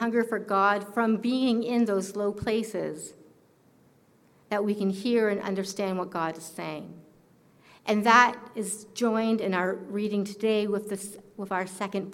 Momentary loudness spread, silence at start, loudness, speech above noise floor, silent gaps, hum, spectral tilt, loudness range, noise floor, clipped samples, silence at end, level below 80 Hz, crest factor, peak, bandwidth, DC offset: 12 LU; 0 s; -27 LUFS; 34 dB; none; none; -5 dB/octave; 5 LU; -61 dBFS; under 0.1%; 0 s; -66 dBFS; 22 dB; -6 dBFS; 16.5 kHz; under 0.1%